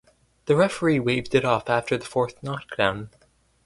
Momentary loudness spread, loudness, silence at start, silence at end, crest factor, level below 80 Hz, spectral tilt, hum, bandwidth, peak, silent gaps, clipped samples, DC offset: 13 LU; -23 LUFS; 0.45 s; 0.55 s; 20 dB; -56 dBFS; -6 dB/octave; none; 11.5 kHz; -4 dBFS; none; under 0.1%; under 0.1%